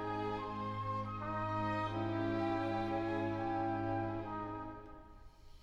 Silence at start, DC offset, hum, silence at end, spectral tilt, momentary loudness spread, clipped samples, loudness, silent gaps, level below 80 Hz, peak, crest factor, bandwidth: 0 s; under 0.1%; none; 0.05 s; -8 dB/octave; 8 LU; under 0.1%; -38 LUFS; none; -58 dBFS; -26 dBFS; 14 dB; 8 kHz